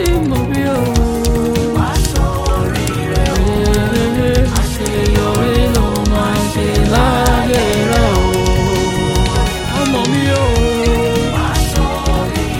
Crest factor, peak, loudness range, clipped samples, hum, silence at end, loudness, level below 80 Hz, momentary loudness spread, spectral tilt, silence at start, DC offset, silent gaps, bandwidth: 14 dB; 0 dBFS; 2 LU; under 0.1%; none; 0 s; -14 LUFS; -18 dBFS; 3 LU; -5.5 dB/octave; 0 s; under 0.1%; none; 17.5 kHz